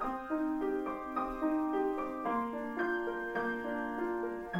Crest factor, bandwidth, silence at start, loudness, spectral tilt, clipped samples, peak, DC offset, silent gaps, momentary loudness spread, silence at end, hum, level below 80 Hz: 12 dB; 16.5 kHz; 0 s; -35 LUFS; -7 dB/octave; under 0.1%; -22 dBFS; under 0.1%; none; 4 LU; 0 s; none; -58 dBFS